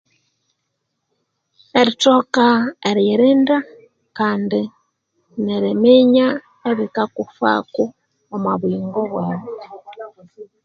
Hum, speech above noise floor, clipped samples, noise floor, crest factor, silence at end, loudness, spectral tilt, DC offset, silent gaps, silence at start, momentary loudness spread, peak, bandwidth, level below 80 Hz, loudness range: none; 57 dB; under 0.1%; -74 dBFS; 18 dB; 0.2 s; -17 LUFS; -5.5 dB/octave; under 0.1%; none; 1.75 s; 20 LU; 0 dBFS; 7.8 kHz; -64 dBFS; 6 LU